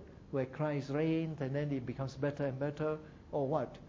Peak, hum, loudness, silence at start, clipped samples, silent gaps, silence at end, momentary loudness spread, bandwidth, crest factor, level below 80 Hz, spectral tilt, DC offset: -20 dBFS; none; -37 LUFS; 0 s; under 0.1%; none; 0 s; 6 LU; 7.6 kHz; 16 dB; -62 dBFS; -8.5 dB/octave; under 0.1%